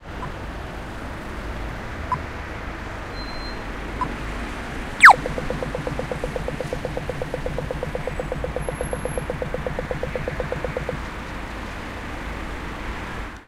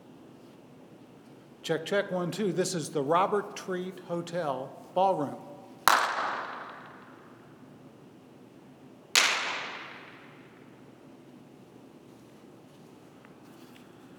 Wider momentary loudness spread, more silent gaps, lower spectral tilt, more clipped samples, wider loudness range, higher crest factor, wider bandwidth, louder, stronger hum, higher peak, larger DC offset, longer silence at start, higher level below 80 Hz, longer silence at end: second, 5 LU vs 28 LU; neither; first, -4.5 dB/octave vs -3 dB/octave; neither; first, 12 LU vs 4 LU; second, 24 dB vs 32 dB; second, 16 kHz vs over 20 kHz; first, -24 LUFS vs -29 LUFS; neither; about the same, 0 dBFS vs -2 dBFS; neither; about the same, 0 s vs 0 s; first, -34 dBFS vs -76 dBFS; about the same, 0.05 s vs 0 s